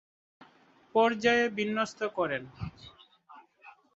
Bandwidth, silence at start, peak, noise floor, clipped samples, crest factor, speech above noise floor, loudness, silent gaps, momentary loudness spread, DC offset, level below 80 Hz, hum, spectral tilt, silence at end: 8 kHz; 0.95 s; -10 dBFS; -62 dBFS; under 0.1%; 22 dB; 33 dB; -29 LUFS; none; 18 LU; under 0.1%; -62 dBFS; none; -4.5 dB/octave; 0.25 s